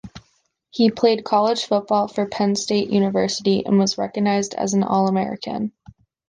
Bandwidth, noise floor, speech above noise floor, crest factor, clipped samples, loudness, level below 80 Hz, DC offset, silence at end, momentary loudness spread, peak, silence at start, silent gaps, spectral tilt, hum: 9.8 kHz; -65 dBFS; 46 dB; 16 dB; under 0.1%; -20 LUFS; -58 dBFS; under 0.1%; 0.6 s; 8 LU; -4 dBFS; 0.05 s; none; -5 dB/octave; none